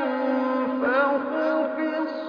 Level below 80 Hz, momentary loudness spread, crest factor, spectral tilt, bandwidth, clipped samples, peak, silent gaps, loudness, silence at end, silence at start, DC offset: -72 dBFS; 4 LU; 14 dB; -6.5 dB/octave; 5.4 kHz; under 0.1%; -10 dBFS; none; -24 LUFS; 0 s; 0 s; under 0.1%